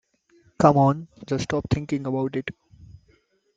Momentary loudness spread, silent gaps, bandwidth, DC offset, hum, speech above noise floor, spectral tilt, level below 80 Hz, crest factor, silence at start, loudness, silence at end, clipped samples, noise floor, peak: 14 LU; none; 7.8 kHz; under 0.1%; none; 41 dB; -7.5 dB/octave; -50 dBFS; 22 dB; 0.6 s; -23 LUFS; 0.7 s; under 0.1%; -63 dBFS; -2 dBFS